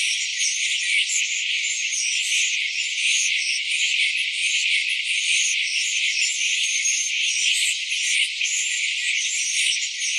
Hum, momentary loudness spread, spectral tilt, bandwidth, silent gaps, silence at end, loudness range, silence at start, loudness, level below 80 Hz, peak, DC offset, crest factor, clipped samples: none; 3 LU; 15.5 dB/octave; 14 kHz; none; 0 s; 1 LU; 0 s; -20 LUFS; under -90 dBFS; -8 dBFS; under 0.1%; 14 dB; under 0.1%